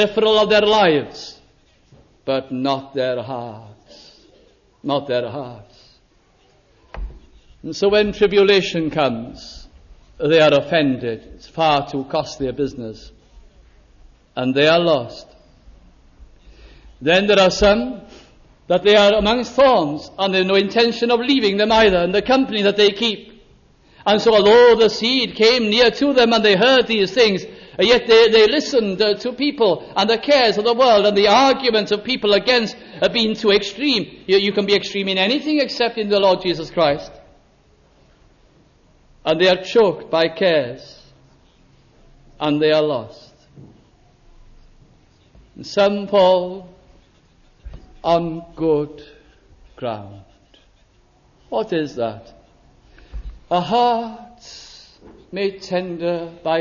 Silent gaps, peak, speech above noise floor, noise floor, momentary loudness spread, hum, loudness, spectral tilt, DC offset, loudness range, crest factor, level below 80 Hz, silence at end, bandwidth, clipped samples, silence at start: none; -2 dBFS; 39 dB; -56 dBFS; 18 LU; none; -17 LUFS; -4.5 dB/octave; under 0.1%; 11 LU; 16 dB; -46 dBFS; 0 s; 7.2 kHz; under 0.1%; 0 s